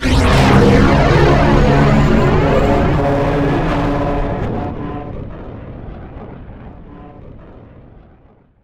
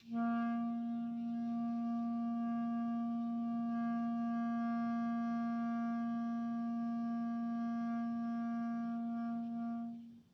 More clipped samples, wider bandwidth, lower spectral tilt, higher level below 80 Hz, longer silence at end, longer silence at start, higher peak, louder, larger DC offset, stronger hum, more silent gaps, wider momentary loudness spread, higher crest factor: neither; first, 12.5 kHz vs 6 kHz; second, -7 dB/octave vs -8.5 dB/octave; first, -22 dBFS vs -84 dBFS; first, 1.2 s vs 0.1 s; about the same, 0 s vs 0.05 s; first, -2 dBFS vs -30 dBFS; first, -13 LUFS vs -39 LUFS; neither; neither; neither; first, 22 LU vs 3 LU; about the same, 12 dB vs 8 dB